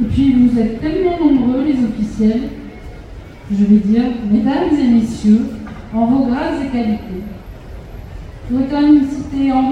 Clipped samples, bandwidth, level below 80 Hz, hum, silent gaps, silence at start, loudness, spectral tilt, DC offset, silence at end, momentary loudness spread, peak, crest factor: under 0.1%; 9.6 kHz; -34 dBFS; none; none; 0 s; -15 LUFS; -8 dB/octave; under 0.1%; 0 s; 22 LU; -2 dBFS; 14 dB